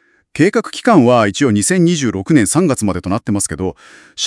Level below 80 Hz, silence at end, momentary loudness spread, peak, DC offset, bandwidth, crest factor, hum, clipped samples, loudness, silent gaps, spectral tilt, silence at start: -48 dBFS; 0 s; 10 LU; 0 dBFS; under 0.1%; 12 kHz; 14 dB; none; under 0.1%; -14 LUFS; none; -5 dB/octave; 0.35 s